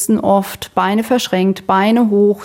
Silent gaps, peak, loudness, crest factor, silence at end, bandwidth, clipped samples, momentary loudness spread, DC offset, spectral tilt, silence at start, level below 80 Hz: none; -2 dBFS; -14 LUFS; 12 dB; 0 s; 17 kHz; under 0.1%; 4 LU; under 0.1%; -5 dB/octave; 0 s; -52 dBFS